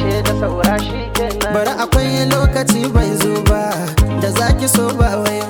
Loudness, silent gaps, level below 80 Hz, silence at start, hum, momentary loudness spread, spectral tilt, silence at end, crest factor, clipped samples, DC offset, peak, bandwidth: -15 LUFS; none; -22 dBFS; 0 s; none; 4 LU; -5 dB/octave; 0 s; 14 dB; under 0.1%; under 0.1%; -2 dBFS; 19.5 kHz